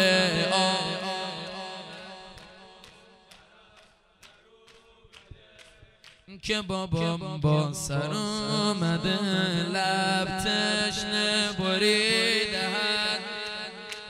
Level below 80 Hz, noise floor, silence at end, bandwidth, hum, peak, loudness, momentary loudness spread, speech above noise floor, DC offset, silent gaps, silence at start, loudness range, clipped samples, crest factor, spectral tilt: -56 dBFS; -58 dBFS; 0 s; 16 kHz; none; -6 dBFS; -26 LUFS; 14 LU; 32 dB; under 0.1%; none; 0 s; 14 LU; under 0.1%; 22 dB; -4 dB/octave